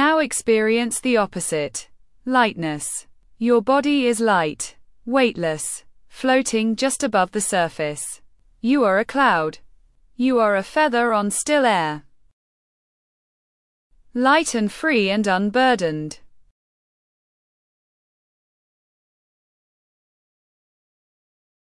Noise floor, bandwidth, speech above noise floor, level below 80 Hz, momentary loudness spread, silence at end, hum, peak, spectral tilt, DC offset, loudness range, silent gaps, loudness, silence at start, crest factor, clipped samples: -53 dBFS; 12 kHz; 33 dB; -58 dBFS; 12 LU; 5.5 s; none; -4 dBFS; -3.5 dB/octave; under 0.1%; 4 LU; 12.33-13.90 s; -20 LUFS; 0 s; 18 dB; under 0.1%